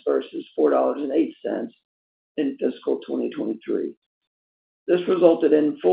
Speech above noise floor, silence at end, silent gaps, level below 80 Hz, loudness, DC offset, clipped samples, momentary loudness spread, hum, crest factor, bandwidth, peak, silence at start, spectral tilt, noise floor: over 68 dB; 0 s; 1.85-2.35 s, 3.97-4.21 s, 4.27-4.86 s; -74 dBFS; -23 LUFS; under 0.1%; under 0.1%; 14 LU; none; 20 dB; 4.8 kHz; -2 dBFS; 0.05 s; -5.5 dB/octave; under -90 dBFS